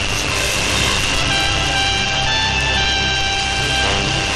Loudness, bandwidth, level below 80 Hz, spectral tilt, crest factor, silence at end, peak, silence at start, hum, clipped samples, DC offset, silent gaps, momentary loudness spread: -15 LUFS; 13.5 kHz; -28 dBFS; -2 dB/octave; 14 dB; 0 s; -2 dBFS; 0 s; none; under 0.1%; under 0.1%; none; 2 LU